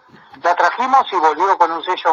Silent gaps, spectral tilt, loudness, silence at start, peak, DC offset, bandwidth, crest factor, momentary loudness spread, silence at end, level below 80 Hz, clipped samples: none; -2.5 dB/octave; -16 LUFS; 0.45 s; 0 dBFS; under 0.1%; 7.4 kHz; 16 dB; 5 LU; 0 s; -68 dBFS; under 0.1%